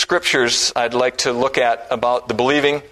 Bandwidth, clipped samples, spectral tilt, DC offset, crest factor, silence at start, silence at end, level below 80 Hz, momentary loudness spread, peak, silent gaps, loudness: 13.5 kHz; under 0.1%; -2.5 dB/octave; under 0.1%; 18 dB; 0 s; 0.05 s; -52 dBFS; 4 LU; 0 dBFS; none; -17 LUFS